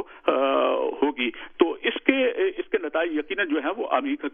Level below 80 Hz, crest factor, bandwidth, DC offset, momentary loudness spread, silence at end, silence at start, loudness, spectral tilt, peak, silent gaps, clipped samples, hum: -62 dBFS; 22 dB; 3.7 kHz; under 0.1%; 5 LU; 0.05 s; 0 s; -24 LUFS; -7 dB/octave; -2 dBFS; none; under 0.1%; none